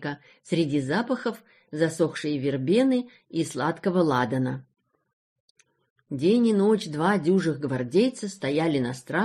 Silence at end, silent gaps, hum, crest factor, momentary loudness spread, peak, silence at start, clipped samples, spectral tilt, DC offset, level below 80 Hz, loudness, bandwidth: 0 s; 5.13-5.55 s, 5.90-5.96 s; none; 16 dB; 10 LU; -8 dBFS; 0 s; under 0.1%; -6.5 dB/octave; under 0.1%; -66 dBFS; -25 LUFS; 13 kHz